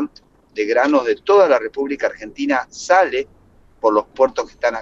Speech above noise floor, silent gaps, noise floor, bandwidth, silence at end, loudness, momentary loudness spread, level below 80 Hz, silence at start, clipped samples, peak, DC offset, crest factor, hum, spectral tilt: 33 dB; none; -50 dBFS; 8 kHz; 0 s; -18 LUFS; 11 LU; -54 dBFS; 0 s; under 0.1%; -2 dBFS; under 0.1%; 16 dB; none; -3.5 dB/octave